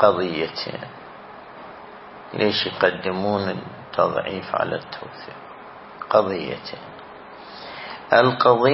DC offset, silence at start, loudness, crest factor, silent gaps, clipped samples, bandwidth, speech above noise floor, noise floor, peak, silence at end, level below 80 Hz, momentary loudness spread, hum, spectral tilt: under 0.1%; 0 s; -22 LUFS; 22 dB; none; under 0.1%; 5.8 kHz; 20 dB; -41 dBFS; -2 dBFS; 0 s; -62 dBFS; 23 LU; none; -9 dB/octave